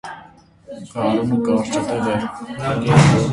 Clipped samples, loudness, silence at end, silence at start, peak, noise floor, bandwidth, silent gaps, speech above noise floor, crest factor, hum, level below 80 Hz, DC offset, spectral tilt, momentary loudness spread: under 0.1%; -18 LUFS; 0 s; 0.05 s; 0 dBFS; -46 dBFS; 11.5 kHz; none; 28 dB; 18 dB; none; -44 dBFS; under 0.1%; -6.5 dB/octave; 23 LU